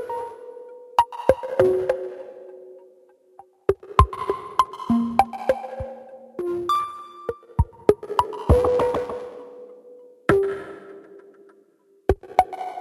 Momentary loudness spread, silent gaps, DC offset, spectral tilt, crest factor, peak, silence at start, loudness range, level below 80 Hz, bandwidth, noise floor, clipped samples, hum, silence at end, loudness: 21 LU; none; under 0.1%; -7.5 dB/octave; 24 dB; 0 dBFS; 0 s; 3 LU; -36 dBFS; 15.5 kHz; -59 dBFS; under 0.1%; none; 0 s; -23 LUFS